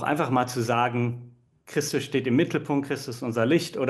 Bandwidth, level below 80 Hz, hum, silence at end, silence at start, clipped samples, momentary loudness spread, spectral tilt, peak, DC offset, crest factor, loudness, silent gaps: 12.5 kHz; -68 dBFS; none; 0 s; 0 s; under 0.1%; 7 LU; -5.5 dB/octave; -10 dBFS; under 0.1%; 16 dB; -26 LUFS; none